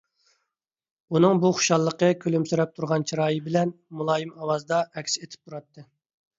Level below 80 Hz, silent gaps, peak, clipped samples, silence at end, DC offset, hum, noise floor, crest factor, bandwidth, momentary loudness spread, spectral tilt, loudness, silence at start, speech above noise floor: -70 dBFS; none; -6 dBFS; under 0.1%; 0.55 s; under 0.1%; none; -84 dBFS; 20 dB; 7.8 kHz; 10 LU; -5 dB/octave; -24 LUFS; 1.1 s; 60 dB